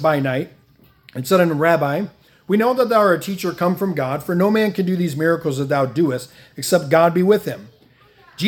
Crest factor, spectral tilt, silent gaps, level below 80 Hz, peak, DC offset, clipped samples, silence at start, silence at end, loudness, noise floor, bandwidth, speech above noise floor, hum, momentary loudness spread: 18 dB; -6 dB/octave; none; -62 dBFS; 0 dBFS; under 0.1%; under 0.1%; 0 s; 0 s; -18 LUFS; -53 dBFS; 18 kHz; 35 dB; none; 13 LU